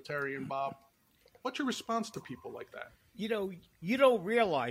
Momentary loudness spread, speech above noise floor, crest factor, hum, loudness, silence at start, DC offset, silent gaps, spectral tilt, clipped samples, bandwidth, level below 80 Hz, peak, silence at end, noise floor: 19 LU; 32 dB; 20 dB; none; -33 LUFS; 0.05 s; under 0.1%; none; -5 dB/octave; under 0.1%; 16 kHz; -72 dBFS; -14 dBFS; 0 s; -66 dBFS